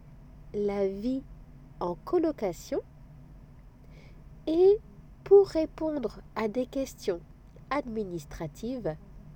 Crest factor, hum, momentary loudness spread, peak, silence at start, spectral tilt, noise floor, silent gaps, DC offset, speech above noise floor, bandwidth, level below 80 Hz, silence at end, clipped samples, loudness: 20 dB; none; 16 LU; -10 dBFS; 0.05 s; -6.5 dB/octave; -51 dBFS; none; under 0.1%; 23 dB; 16.5 kHz; -52 dBFS; 0 s; under 0.1%; -29 LUFS